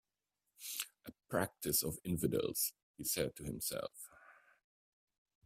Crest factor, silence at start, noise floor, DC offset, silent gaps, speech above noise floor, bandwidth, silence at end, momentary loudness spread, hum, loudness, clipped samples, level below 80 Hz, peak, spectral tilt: 22 dB; 0.6 s; -89 dBFS; under 0.1%; 2.83-2.94 s; 50 dB; 16 kHz; 1.15 s; 14 LU; none; -39 LUFS; under 0.1%; -66 dBFS; -20 dBFS; -3.5 dB/octave